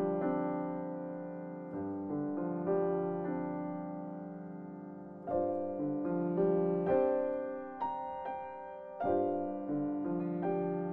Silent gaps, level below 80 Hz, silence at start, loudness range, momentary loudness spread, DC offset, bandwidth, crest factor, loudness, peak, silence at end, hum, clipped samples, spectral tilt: none; -70 dBFS; 0 s; 4 LU; 14 LU; under 0.1%; 4 kHz; 16 dB; -36 LUFS; -18 dBFS; 0 s; none; under 0.1%; -11.5 dB/octave